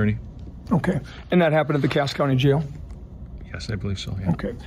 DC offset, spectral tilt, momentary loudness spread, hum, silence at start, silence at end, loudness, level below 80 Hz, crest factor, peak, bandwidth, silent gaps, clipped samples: under 0.1%; -7 dB/octave; 20 LU; none; 0 s; 0 s; -23 LUFS; -40 dBFS; 16 dB; -8 dBFS; 14 kHz; none; under 0.1%